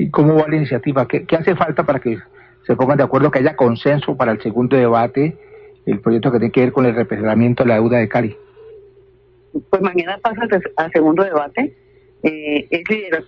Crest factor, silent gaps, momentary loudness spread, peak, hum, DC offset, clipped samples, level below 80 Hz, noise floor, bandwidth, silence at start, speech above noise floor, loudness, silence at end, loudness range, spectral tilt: 14 dB; none; 8 LU; -2 dBFS; none; under 0.1%; under 0.1%; -50 dBFS; -50 dBFS; 5.8 kHz; 0 s; 35 dB; -16 LUFS; 0.05 s; 3 LU; -10 dB/octave